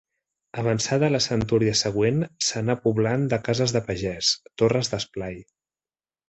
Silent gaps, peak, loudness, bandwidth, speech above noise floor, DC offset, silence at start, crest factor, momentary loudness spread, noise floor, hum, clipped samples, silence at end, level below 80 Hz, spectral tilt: none; -8 dBFS; -23 LUFS; 8.4 kHz; over 67 dB; under 0.1%; 0.55 s; 18 dB; 8 LU; under -90 dBFS; none; under 0.1%; 0.85 s; -52 dBFS; -4.5 dB/octave